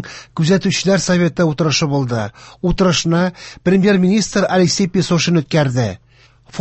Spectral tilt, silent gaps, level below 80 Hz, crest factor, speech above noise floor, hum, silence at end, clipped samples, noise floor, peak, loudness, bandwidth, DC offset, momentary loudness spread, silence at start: -5 dB/octave; none; -40 dBFS; 14 dB; 30 dB; none; 0 s; under 0.1%; -45 dBFS; -2 dBFS; -15 LUFS; 8.4 kHz; under 0.1%; 9 LU; 0 s